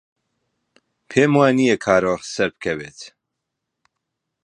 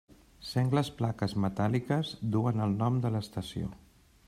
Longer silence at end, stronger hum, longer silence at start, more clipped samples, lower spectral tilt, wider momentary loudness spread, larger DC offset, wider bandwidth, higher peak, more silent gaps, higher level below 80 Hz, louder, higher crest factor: first, 1.35 s vs 0.5 s; neither; first, 1.1 s vs 0.1 s; neither; second, -5.5 dB/octave vs -7.5 dB/octave; first, 20 LU vs 9 LU; neither; second, 11 kHz vs 14 kHz; first, 0 dBFS vs -14 dBFS; neither; about the same, -56 dBFS vs -58 dBFS; first, -18 LUFS vs -31 LUFS; about the same, 20 dB vs 16 dB